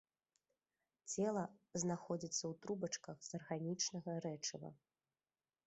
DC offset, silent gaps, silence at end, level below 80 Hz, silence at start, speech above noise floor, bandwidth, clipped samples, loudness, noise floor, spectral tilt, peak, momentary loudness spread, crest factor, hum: under 0.1%; none; 0.9 s; -84 dBFS; 1.05 s; over 46 dB; 8.2 kHz; under 0.1%; -44 LUFS; under -90 dBFS; -4 dB/octave; -26 dBFS; 9 LU; 20 dB; none